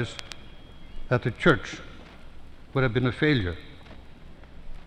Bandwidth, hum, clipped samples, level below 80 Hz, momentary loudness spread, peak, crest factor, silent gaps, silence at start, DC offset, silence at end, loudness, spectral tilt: 10 kHz; none; under 0.1%; -42 dBFS; 25 LU; -6 dBFS; 22 dB; none; 0 s; under 0.1%; 0 s; -26 LUFS; -6.5 dB/octave